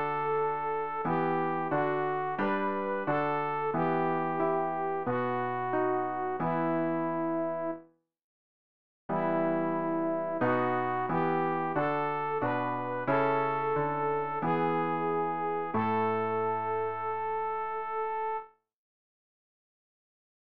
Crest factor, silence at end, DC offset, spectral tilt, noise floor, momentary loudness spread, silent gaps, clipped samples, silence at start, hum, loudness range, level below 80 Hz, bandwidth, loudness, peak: 16 dB; 1.7 s; 0.3%; -6 dB/octave; -55 dBFS; 4 LU; 8.24-9.09 s; under 0.1%; 0 s; none; 4 LU; -68 dBFS; 5.2 kHz; -30 LUFS; -16 dBFS